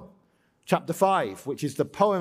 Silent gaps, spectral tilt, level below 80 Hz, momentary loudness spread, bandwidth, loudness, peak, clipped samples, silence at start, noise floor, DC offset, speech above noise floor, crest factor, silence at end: none; -5.5 dB/octave; -68 dBFS; 8 LU; 16 kHz; -26 LUFS; -6 dBFS; under 0.1%; 0 s; -65 dBFS; under 0.1%; 41 dB; 20 dB; 0 s